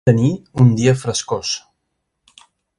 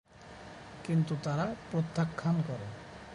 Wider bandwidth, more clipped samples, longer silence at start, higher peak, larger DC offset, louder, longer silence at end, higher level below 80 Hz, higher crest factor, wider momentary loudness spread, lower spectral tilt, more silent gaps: about the same, 11.5 kHz vs 11 kHz; neither; about the same, 0.05 s vs 0.15 s; first, 0 dBFS vs -18 dBFS; neither; first, -17 LUFS vs -33 LUFS; first, 1.2 s vs 0 s; first, -48 dBFS vs -62 dBFS; about the same, 18 dB vs 16 dB; second, 9 LU vs 17 LU; second, -6 dB/octave vs -7.5 dB/octave; neither